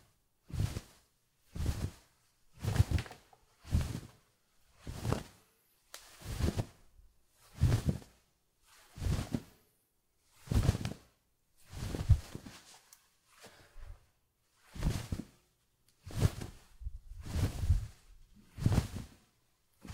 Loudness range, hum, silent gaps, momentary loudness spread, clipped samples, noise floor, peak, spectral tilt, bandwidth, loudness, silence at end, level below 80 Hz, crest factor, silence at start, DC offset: 5 LU; none; none; 24 LU; under 0.1%; -76 dBFS; -14 dBFS; -6 dB/octave; 16 kHz; -37 LUFS; 0 s; -44 dBFS; 24 dB; 0.5 s; under 0.1%